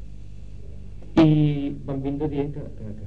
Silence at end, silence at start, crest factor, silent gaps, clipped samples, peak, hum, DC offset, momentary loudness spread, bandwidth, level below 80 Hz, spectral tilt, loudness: 0 s; 0 s; 20 dB; none; under 0.1%; -4 dBFS; 50 Hz at -35 dBFS; 1%; 25 LU; 6.6 kHz; -42 dBFS; -9 dB/octave; -23 LUFS